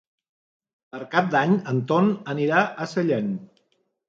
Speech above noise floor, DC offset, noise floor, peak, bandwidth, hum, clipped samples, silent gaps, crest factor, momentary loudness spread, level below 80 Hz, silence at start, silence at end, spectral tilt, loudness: 48 dB; under 0.1%; -70 dBFS; -4 dBFS; 7.6 kHz; none; under 0.1%; none; 20 dB; 11 LU; -70 dBFS; 0.95 s; 0.65 s; -7 dB/octave; -23 LUFS